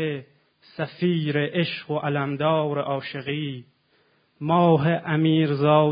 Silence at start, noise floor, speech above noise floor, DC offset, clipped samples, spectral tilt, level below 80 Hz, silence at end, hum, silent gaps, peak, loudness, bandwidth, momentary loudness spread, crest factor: 0 s; -64 dBFS; 42 dB; under 0.1%; under 0.1%; -11.5 dB/octave; -66 dBFS; 0 s; none; none; -4 dBFS; -23 LUFS; 5.2 kHz; 14 LU; 18 dB